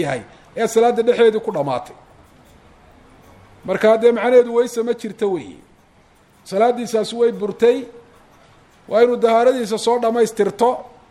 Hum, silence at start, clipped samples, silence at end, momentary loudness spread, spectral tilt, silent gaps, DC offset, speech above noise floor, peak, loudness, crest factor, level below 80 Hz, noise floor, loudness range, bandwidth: none; 0 s; under 0.1%; 0.3 s; 12 LU; -5 dB/octave; none; under 0.1%; 36 dB; -2 dBFS; -17 LUFS; 18 dB; -58 dBFS; -52 dBFS; 3 LU; 13 kHz